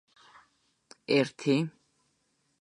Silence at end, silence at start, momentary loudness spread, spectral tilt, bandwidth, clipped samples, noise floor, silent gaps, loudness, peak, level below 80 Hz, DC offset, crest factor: 0.95 s; 1.1 s; 12 LU; -6 dB/octave; 10.5 kHz; under 0.1%; -74 dBFS; none; -29 LUFS; -10 dBFS; -80 dBFS; under 0.1%; 22 dB